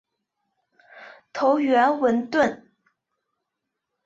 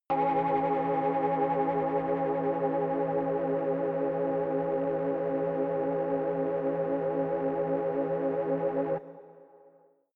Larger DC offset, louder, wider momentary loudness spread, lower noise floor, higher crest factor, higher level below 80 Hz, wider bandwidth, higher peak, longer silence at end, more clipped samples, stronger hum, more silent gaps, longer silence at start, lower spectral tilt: neither; first, -21 LUFS vs -29 LUFS; first, 12 LU vs 2 LU; first, -82 dBFS vs -61 dBFS; first, 18 dB vs 12 dB; about the same, -68 dBFS vs -66 dBFS; first, 7.8 kHz vs 4.4 kHz; first, -8 dBFS vs -18 dBFS; first, 1.5 s vs 0.7 s; neither; neither; neither; first, 0.95 s vs 0.1 s; second, -5 dB/octave vs -10.5 dB/octave